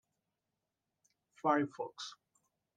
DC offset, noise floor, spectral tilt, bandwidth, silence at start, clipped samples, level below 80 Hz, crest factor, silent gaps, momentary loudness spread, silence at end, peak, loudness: under 0.1%; -89 dBFS; -5 dB/octave; 9.4 kHz; 1.45 s; under 0.1%; under -90 dBFS; 24 dB; none; 15 LU; 0.65 s; -16 dBFS; -36 LUFS